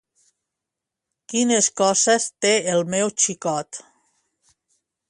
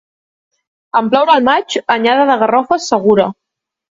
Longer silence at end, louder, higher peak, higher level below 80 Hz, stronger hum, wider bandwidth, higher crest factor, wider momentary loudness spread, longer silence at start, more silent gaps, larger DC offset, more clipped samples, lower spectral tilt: first, 1.3 s vs 0.6 s; second, -20 LUFS vs -12 LUFS; second, -4 dBFS vs 0 dBFS; second, -70 dBFS vs -58 dBFS; neither; first, 11.5 kHz vs 7.8 kHz; first, 20 dB vs 14 dB; first, 10 LU vs 6 LU; first, 1.3 s vs 0.95 s; neither; neither; neither; second, -2.5 dB/octave vs -4.5 dB/octave